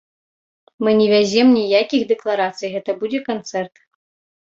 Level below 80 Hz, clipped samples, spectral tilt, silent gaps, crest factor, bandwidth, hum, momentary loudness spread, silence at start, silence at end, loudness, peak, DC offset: -62 dBFS; under 0.1%; -5 dB/octave; none; 16 dB; 7.8 kHz; none; 12 LU; 0.8 s; 0.75 s; -18 LUFS; -2 dBFS; under 0.1%